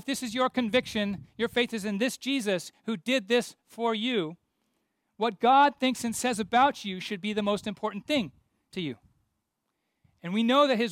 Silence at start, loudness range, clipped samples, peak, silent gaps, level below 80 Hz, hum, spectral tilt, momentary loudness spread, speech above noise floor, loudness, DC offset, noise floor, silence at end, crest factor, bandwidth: 0.05 s; 7 LU; under 0.1%; -12 dBFS; none; -66 dBFS; none; -4 dB/octave; 13 LU; 53 dB; -28 LUFS; under 0.1%; -81 dBFS; 0 s; 18 dB; 16 kHz